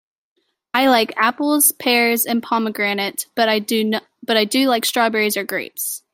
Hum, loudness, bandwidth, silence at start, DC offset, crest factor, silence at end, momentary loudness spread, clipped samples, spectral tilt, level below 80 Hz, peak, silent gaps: none; -18 LUFS; 16.5 kHz; 0.75 s; under 0.1%; 18 dB; 0.15 s; 8 LU; under 0.1%; -2 dB/octave; -68 dBFS; -2 dBFS; none